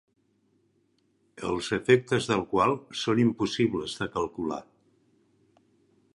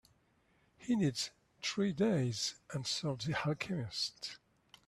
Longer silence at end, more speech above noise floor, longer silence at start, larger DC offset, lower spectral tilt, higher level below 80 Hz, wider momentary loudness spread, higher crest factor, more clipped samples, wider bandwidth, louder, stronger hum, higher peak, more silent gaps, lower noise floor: first, 1.55 s vs 0.5 s; first, 43 dB vs 37 dB; first, 1.35 s vs 0.8 s; neither; about the same, -5.5 dB/octave vs -4.5 dB/octave; first, -60 dBFS vs -70 dBFS; about the same, 10 LU vs 10 LU; first, 22 dB vs 16 dB; neither; second, 11.5 kHz vs 13 kHz; first, -27 LUFS vs -36 LUFS; neither; first, -6 dBFS vs -22 dBFS; neither; about the same, -70 dBFS vs -73 dBFS